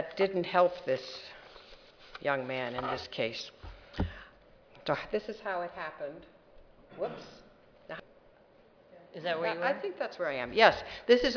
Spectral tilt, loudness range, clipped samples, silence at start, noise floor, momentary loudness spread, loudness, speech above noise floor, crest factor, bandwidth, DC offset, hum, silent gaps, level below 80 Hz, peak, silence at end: -5 dB/octave; 11 LU; under 0.1%; 0 s; -61 dBFS; 22 LU; -32 LUFS; 30 dB; 28 dB; 5.4 kHz; under 0.1%; none; none; -56 dBFS; -6 dBFS; 0 s